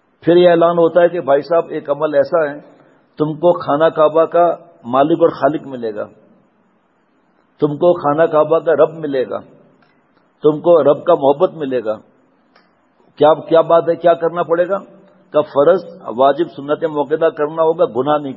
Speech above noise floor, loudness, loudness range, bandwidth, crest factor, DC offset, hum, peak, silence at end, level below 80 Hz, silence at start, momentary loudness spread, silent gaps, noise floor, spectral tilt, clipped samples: 44 dB; -15 LUFS; 3 LU; 5.8 kHz; 16 dB; under 0.1%; none; 0 dBFS; 0 s; -66 dBFS; 0.25 s; 10 LU; none; -58 dBFS; -9.5 dB/octave; under 0.1%